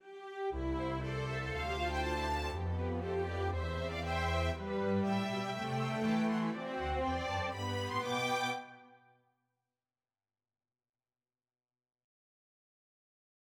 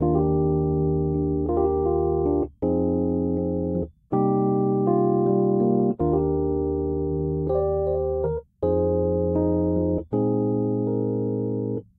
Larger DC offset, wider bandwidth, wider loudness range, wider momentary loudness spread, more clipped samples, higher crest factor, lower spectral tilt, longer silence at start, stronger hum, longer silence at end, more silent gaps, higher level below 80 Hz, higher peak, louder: neither; first, 16.5 kHz vs 2.1 kHz; first, 5 LU vs 2 LU; about the same, 5 LU vs 5 LU; neither; about the same, 16 dB vs 14 dB; second, -6 dB/octave vs -15 dB/octave; about the same, 0.05 s vs 0 s; neither; first, 4.5 s vs 0.15 s; neither; second, -48 dBFS vs -38 dBFS; second, -22 dBFS vs -8 dBFS; second, -36 LUFS vs -23 LUFS